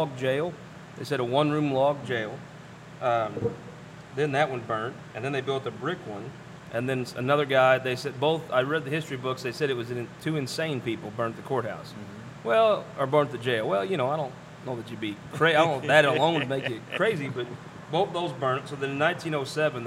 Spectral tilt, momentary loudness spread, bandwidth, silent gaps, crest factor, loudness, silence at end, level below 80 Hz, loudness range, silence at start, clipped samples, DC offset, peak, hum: -5.5 dB/octave; 16 LU; 15.5 kHz; none; 24 dB; -27 LUFS; 0 s; -66 dBFS; 6 LU; 0 s; under 0.1%; under 0.1%; -4 dBFS; none